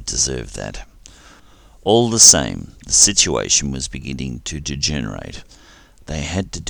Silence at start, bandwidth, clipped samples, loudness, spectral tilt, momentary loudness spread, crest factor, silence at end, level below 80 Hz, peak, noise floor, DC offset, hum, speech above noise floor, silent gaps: 0 s; over 20 kHz; under 0.1%; -14 LUFS; -2 dB/octave; 22 LU; 20 dB; 0 s; -36 dBFS; 0 dBFS; -46 dBFS; under 0.1%; none; 28 dB; none